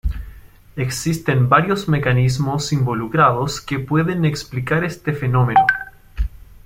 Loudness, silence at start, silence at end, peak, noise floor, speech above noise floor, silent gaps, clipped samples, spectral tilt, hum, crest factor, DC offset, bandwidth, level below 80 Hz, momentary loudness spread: -18 LUFS; 0.05 s; 0.1 s; -2 dBFS; -40 dBFS; 23 dB; none; under 0.1%; -6 dB/octave; none; 18 dB; under 0.1%; 16 kHz; -34 dBFS; 14 LU